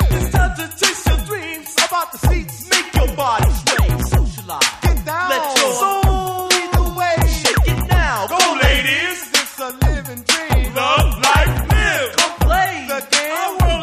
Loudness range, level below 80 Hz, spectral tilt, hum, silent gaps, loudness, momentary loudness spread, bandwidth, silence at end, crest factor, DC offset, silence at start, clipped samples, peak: 2 LU; -20 dBFS; -3.5 dB/octave; none; none; -16 LUFS; 6 LU; 15.5 kHz; 0 s; 16 dB; under 0.1%; 0 s; under 0.1%; 0 dBFS